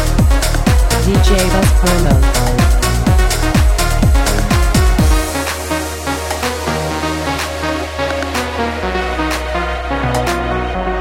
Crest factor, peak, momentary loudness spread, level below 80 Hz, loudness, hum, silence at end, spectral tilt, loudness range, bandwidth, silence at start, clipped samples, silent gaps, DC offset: 12 dB; 0 dBFS; 7 LU; -16 dBFS; -15 LUFS; none; 0 s; -5 dB/octave; 5 LU; 16.5 kHz; 0 s; under 0.1%; none; under 0.1%